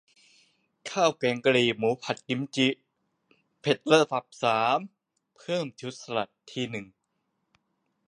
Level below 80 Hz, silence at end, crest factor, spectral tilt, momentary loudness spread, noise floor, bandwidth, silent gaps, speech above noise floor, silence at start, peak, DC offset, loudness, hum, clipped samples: -72 dBFS; 1.25 s; 24 dB; -4.5 dB/octave; 15 LU; -78 dBFS; 10.5 kHz; none; 51 dB; 0.85 s; -4 dBFS; under 0.1%; -27 LUFS; none; under 0.1%